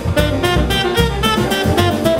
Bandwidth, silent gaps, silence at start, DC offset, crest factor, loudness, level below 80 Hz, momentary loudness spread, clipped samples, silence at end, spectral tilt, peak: 16.5 kHz; none; 0 s; under 0.1%; 14 dB; -15 LUFS; -24 dBFS; 1 LU; under 0.1%; 0 s; -5 dB/octave; 0 dBFS